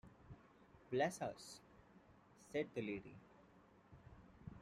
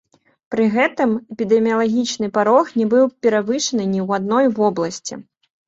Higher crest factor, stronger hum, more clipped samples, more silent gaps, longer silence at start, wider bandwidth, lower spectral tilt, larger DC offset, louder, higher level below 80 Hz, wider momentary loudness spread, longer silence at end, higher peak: first, 24 dB vs 16 dB; neither; neither; neither; second, 0.05 s vs 0.5 s; first, 14 kHz vs 7.8 kHz; about the same, -5 dB/octave vs -5 dB/octave; neither; second, -45 LUFS vs -18 LUFS; second, -74 dBFS vs -62 dBFS; first, 26 LU vs 8 LU; second, 0 s vs 0.45 s; second, -26 dBFS vs -2 dBFS